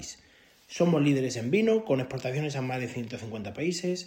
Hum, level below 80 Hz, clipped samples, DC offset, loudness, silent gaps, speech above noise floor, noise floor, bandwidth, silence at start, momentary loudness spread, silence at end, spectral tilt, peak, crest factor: none; -66 dBFS; under 0.1%; under 0.1%; -28 LUFS; none; 31 dB; -59 dBFS; 16 kHz; 0 s; 13 LU; 0 s; -6 dB/octave; -12 dBFS; 16 dB